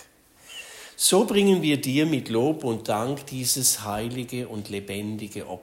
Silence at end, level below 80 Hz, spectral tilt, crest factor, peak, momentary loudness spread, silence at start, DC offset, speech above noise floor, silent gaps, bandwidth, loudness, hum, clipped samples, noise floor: 0 s; -58 dBFS; -4 dB/octave; 18 dB; -6 dBFS; 16 LU; 0 s; under 0.1%; 28 dB; none; 16.5 kHz; -24 LUFS; none; under 0.1%; -53 dBFS